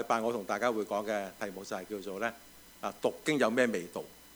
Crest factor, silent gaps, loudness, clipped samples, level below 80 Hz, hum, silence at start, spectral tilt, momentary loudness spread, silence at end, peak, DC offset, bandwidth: 20 dB; none; -33 LUFS; under 0.1%; -70 dBFS; none; 0 s; -4 dB/octave; 13 LU; 0 s; -14 dBFS; under 0.1%; over 20 kHz